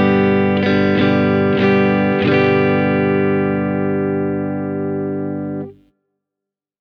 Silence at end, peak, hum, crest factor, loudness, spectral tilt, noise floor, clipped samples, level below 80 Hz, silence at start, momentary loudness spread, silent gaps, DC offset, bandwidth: 1.1 s; -2 dBFS; 50 Hz at -50 dBFS; 14 dB; -16 LUFS; -9 dB/octave; -84 dBFS; under 0.1%; -56 dBFS; 0 s; 9 LU; none; under 0.1%; 6.2 kHz